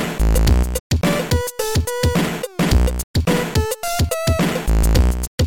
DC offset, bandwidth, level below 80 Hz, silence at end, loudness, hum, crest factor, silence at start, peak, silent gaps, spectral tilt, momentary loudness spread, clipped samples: under 0.1%; 17 kHz; -20 dBFS; 0 s; -19 LUFS; none; 14 dB; 0 s; -4 dBFS; 0.80-0.90 s, 3.04-3.14 s, 5.27-5.38 s; -5 dB/octave; 4 LU; under 0.1%